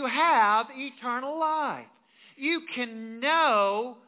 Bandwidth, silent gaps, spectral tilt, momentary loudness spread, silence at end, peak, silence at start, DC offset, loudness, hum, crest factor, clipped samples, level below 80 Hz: 4 kHz; none; 0 dB/octave; 12 LU; 0.15 s; -12 dBFS; 0 s; under 0.1%; -26 LUFS; none; 16 dB; under 0.1%; under -90 dBFS